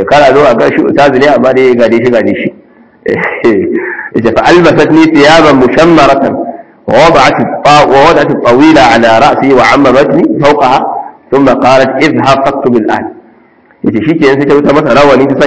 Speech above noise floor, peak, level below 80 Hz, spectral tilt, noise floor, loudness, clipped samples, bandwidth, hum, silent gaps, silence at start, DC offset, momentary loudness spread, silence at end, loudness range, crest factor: 37 dB; 0 dBFS; -36 dBFS; -5.5 dB/octave; -42 dBFS; -5 LUFS; 20%; 8 kHz; none; none; 0 s; 1%; 10 LU; 0 s; 4 LU; 6 dB